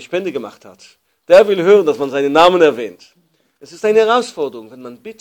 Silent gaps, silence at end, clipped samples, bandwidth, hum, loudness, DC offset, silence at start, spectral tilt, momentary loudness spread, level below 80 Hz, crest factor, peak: none; 0.1 s; 0.4%; 18 kHz; none; -13 LUFS; under 0.1%; 0 s; -4.5 dB/octave; 23 LU; -58 dBFS; 14 dB; 0 dBFS